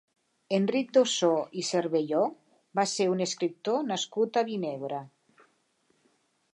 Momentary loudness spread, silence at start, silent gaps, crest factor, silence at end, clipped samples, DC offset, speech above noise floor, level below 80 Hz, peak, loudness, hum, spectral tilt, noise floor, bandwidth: 9 LU; 0.5 s; none; 20 dB; 1.45 s; under 0.1%; under 0.1%; 43 dB; -84 dBFS; -10 dBFS; -28 LUFS; none; -4 dB/octave; -71 dBFS; 11 kHz